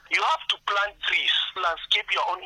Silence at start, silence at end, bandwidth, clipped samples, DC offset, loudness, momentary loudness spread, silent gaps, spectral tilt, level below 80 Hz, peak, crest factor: 0.1 s; 0 s; 13 kHz; under 0.1%; under 0.1%; -23 LUFS; 5 LU; none; 1 dB/octave; -62 dBFS; -8 dBFS; 18 dB